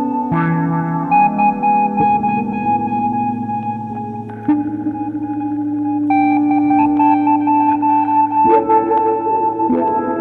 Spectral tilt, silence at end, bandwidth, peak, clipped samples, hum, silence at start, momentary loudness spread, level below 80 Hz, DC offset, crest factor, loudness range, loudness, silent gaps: -10.5 dB/octave; 0 s; 4.1 kHz; -2 dBFS; under 0.1%; none; 0 s; 9 LU; -50 dBFS; under 0.1%; 14 dB; 6 LU; -16 LUFS; none